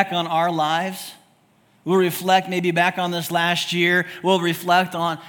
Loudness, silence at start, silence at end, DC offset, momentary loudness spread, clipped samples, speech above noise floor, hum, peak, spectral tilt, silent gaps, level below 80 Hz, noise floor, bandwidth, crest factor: -20 LUFS; 0 s; 0 s; under 0.1%; 6 LU; under 0.1%; 38 dB; none; -2 dBFS; -4.5 dB/octave; none; -70 dBFS; -58 dBFS; 18 kHz; 20 dB